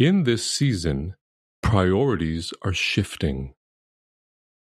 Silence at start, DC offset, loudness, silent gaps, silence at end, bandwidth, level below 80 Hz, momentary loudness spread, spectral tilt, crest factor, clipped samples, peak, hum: 0 s; under 0.1%; -23 LUFS; 1.21-1.63 s; 1.2 s; 13.5 kHz; -40 dBFS; 10 LU; -5.5 dB/octave; 20 dB; under 0.1%; -4 dBFS; none